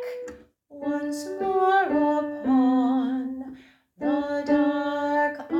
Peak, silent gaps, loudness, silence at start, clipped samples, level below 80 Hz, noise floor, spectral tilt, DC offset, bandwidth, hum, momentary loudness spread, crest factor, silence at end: -10 dBFS; none; -24 LUFS; 0 s; under 0.1%; -62 dBFS; -48 dBFS; -5 dB/octave; under 0.1%; 11 kHz; none; 14 LU; 14 dB; 0 s